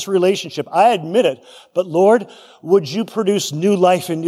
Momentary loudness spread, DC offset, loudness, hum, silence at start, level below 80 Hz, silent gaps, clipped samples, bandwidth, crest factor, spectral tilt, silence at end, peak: 10 LU; under 0.1%; -16 LUFS; none; 0 s; -72 dBFS; none; under 0.1%; 15.5 kHz; 14 dB; -5 dB/octave; 0 s; -2 dBFS